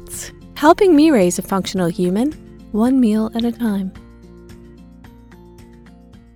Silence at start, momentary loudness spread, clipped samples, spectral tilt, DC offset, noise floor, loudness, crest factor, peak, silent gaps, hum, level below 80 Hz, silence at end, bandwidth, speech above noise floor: 0 s; 18 LU; under 0.1%; -5.5 dB/octave; under 0.1%; -43 dBFS; -16 LUFS; 18 dB; 0 dBFS; none; none; -44 dBFS; 1.8 s; 18.5 kHz; 27 dB